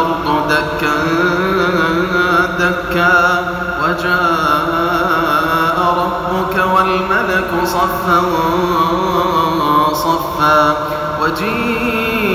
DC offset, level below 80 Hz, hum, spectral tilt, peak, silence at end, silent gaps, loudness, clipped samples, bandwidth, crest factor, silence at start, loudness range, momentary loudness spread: under 0.1%; -36 dBFS; none; -5 dB/octave; 0 dBFS; 0 s; none; -14 LUFS; under 0.1%; 17 kHz; 14 dB; 0 s; 1 LU; 4 LU